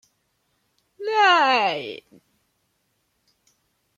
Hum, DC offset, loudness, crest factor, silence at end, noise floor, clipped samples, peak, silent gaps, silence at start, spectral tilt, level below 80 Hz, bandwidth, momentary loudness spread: none; under 0.1%; -19 LUFS; 20 dB; 2 s; -71 dBFS; under 0.1%; -6 dBFS; none; 1 s; -2.5 dB/octave; -78 dBFS; 10 kHz; 20 LU